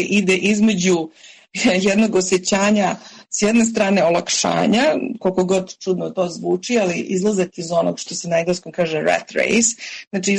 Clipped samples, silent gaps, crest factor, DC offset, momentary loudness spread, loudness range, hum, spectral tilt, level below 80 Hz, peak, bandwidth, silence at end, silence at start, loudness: under 0.1%; 10.07-10.11 s; 12 dB; under 0.1%; 7 LU; 3 LU; none; -4 dB/octave; -56 dBFS; -6 dBFS; 11 kHz; 0 s; 0 s; -18 LUFS